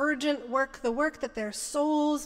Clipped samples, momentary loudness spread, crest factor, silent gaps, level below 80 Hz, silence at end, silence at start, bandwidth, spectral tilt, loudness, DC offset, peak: under 0.1%; 7 LU; 14 dB; none; -58 dBFS; 0 s; 0 s; 16 kHz; -2.5 dB/octave; -29 LUFS; under 0.1%; -14 dBFS